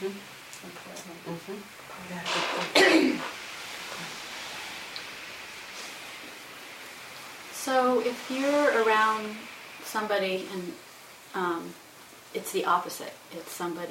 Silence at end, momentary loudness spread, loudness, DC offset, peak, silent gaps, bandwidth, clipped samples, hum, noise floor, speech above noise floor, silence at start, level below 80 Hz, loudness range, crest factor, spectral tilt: 0 s; 19 LU; -28 LUFS; under 0.1%; -6 dBFS; none; 16.5 kHz; under 0.1%; none; -50 dBFS; 22 dB; 0 s; -74 dBFS; 11 LU; 26 dB; -3 dB/octave